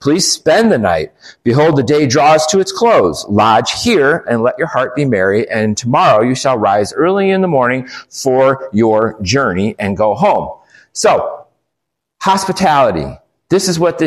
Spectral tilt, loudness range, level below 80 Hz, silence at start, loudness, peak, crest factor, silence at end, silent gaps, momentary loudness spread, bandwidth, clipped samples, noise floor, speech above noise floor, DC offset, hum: -4.5 dB/octave; 4 LU; -46 dBFS; 0 s; -12 LUFS; 0 dBFS; 12 dB; 0 s; none; 8 LU; 14.5 kHz; under 0.1%; -76 dBFS; 64 dB; under 0.1%; none